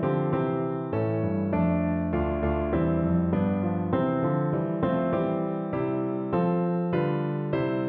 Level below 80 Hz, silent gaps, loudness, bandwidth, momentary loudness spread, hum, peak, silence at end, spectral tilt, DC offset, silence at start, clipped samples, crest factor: -44 dBFS; none; -27 LUFS; 4.3 kHz; 4 LU; none; -14 dBFS; 0 s; -12 dB/octave; under 0.1%; 0 s; under 0.1%; 12 dB